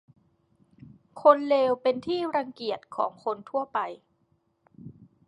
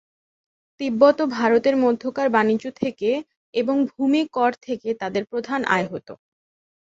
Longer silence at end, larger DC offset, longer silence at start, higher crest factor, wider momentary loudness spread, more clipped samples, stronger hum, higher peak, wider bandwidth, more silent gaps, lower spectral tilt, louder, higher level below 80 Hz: second, 0.35 s vs 0.8 s; neither; about the same, 0.85 s vs 0.8 s; about the same, 24 dB vs 20 dB; about the same, 13 LU vs 11 LU; neither; neither; about the same, -4 dBFS vs -2 dBFS; first, 10 kHz vs 7.8 kHz; second, none vs 3.37-3.53 s; about the same, -6.5 dB/octave vs -6 dB/octave; second, -26 LUFS vs -22 LUFS; second, -72 dBFS vs -66 dBFS